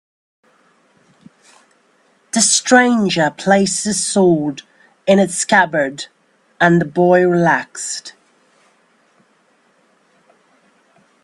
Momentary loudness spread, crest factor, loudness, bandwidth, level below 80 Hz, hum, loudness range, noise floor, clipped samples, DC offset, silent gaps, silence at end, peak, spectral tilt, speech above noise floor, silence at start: 13 LU; 18 dB; -14 LUFS; 12.5 kHz; -60 dBFS; none; 6 LU; -57 dBFS; under 0.1%; under 0.1%; none; 3.15 s; 0 dBFS; -4 dB/octave; 43 dB; 2.35 s